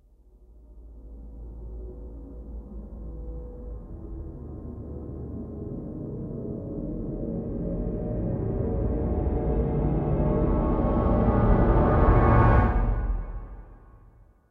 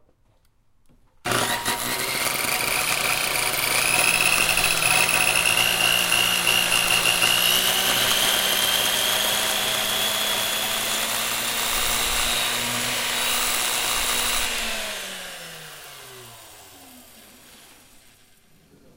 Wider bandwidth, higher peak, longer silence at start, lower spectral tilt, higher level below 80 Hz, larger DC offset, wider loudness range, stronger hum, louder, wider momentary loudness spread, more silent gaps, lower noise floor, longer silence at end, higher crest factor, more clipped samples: second, 3.8 kHz vs 17 kHz; about the same, -6 dBFS vs -6 dBFS; second, 0.4 s vs 1.25 s; first, -11.5 dB/octave vs 0 dB/octave; first, -30 dBFS vs -46 dBFS; neither; first, 19 LU vs 8 LU; neither; second, -26 LUFS vs -20 LUFS; first, 21 LU vs 9 LU; neither; second, -54 dBFS vs -61 dBFS; second, 0.55 s vs 1.4 s; about the same, 20 dB vs 18 dB; neither